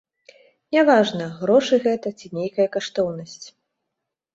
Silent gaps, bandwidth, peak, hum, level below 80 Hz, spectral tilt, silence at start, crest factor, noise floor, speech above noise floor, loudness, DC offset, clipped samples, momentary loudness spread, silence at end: none; 8 kHz; -2 dBFS; none; -66 dBFS; -5 dB/octave; 0.7 s; 20 dB; -82 dBFS; 62 dB; -21 LUFS; under 0.1%; under 0.1%; 14 LU; 0.85 s